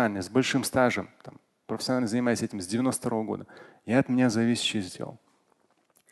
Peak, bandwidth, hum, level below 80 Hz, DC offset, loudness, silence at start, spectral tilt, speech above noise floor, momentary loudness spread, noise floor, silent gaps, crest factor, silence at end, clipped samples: -10 dBFS; 12.5 kHz; none; -62 dBFS; under 0.1%; -27 LUFS; 0 s; -4.5 dB/octave; 41 dB; 14 LU; -68 dBFS; none; 18 dB; 0.95 s; under 0.1%